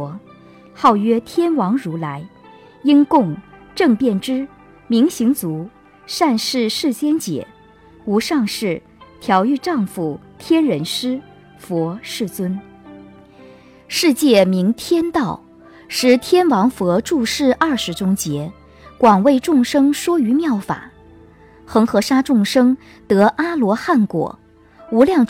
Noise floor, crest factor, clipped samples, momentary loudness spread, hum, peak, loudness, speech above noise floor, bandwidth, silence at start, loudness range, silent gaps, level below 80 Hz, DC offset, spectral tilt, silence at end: -46 dBFS; 16 dB; under 0.1%; 13 LU; none; -2 dBFS; -17 LUFS; 30 dB; 16.5 kHz; 0 s; 4 LU; none; -52 dBFS; under 0.1%; -5 dB/octave; 0.05 s